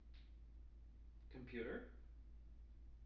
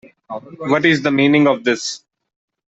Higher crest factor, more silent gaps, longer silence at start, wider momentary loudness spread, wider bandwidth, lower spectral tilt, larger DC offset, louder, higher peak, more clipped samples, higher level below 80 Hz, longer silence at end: about the same, 18 dB vs 16 dB; neither; second, 0 s vs 0.3 s; second, 14 LU vs 19 LU; second, 6 kHz vs 8 kHz; about the same, -6 dB/octave vs -5 dB/octave; neither; second, -57 LUFS vs -15 LUFS; second, -36 dBFS vs -2 dBFS; neither; about the same, -60 dBFS vs -62 dBFS; second, 0 s vs 0.75 s